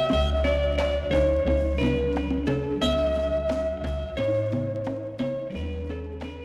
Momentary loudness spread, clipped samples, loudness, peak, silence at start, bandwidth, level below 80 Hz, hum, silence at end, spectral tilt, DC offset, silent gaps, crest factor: 9 LU; under 0.1%; -26 LUFS; -12 dBFS; 0 s; 11 kHz; -32 dBFS; none; 0 s; -7 dB/octave; under 0.1%; none; 14 dB